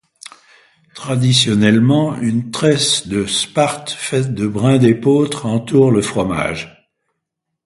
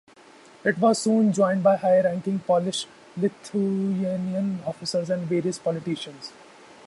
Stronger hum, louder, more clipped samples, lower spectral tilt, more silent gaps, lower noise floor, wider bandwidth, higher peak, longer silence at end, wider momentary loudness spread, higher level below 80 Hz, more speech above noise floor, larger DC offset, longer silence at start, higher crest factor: neither; first, -15 LUFS vs -24 LUFS; neither; about the same, -5 dB/octave vs -5.5 dB/octave; neither; first, -77 dBFS vs -51 dBFS; about the same, 11.5 kHz vs 11.5 kHz; first, 0 dBFS vs -8 dBFS; first, 0.95 s vs 0.55 s; second, 8 LU vs 11 LU; first, -48 dBFS vs -68 dBFS; first, 62 dB vs 27 dB; neither; first, 0.95 s vs 0.65 s; about the same, 16 dB vs 16 dB